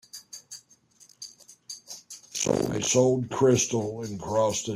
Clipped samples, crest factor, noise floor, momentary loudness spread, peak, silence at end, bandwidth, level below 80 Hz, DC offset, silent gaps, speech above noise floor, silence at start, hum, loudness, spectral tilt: under 0.1%; 18 dB; -58 dBFS; 21 LU; -10 dBFS; 0 s; 15 kHz; -60 dBFS; under 0.1%; none; 34 dB; 0.15 s; none; -25 LUFS; -4.5 dB/octave